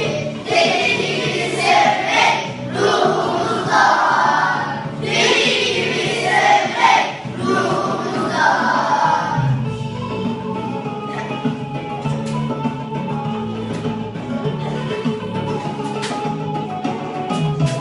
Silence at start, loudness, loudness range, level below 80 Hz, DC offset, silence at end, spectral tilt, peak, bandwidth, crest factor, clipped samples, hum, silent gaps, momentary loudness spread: 0 s; -18 LUFS; 8 LU; -50 dBFS; under 0.1%; 0 s; -4.5 dB/octave; 0 dBFS; 11.5 kHz; 18 dB; under 0.1%; none; none; 11 LU